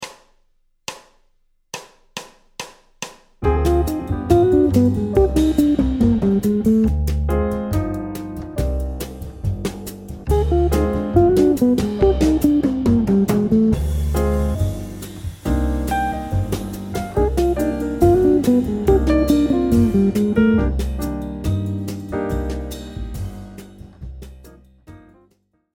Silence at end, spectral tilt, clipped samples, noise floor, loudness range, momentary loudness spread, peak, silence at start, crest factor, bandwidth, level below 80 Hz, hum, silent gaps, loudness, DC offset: 0.8 s; -7.5 dB/octave; under 0.1%; -61 dBFS; 10 LU; 18 LU; 0 dBFS; 0 s; 18 dB; 17.5 kHz; -26 dBFS; none; none; -19 LUFS; under 0.1%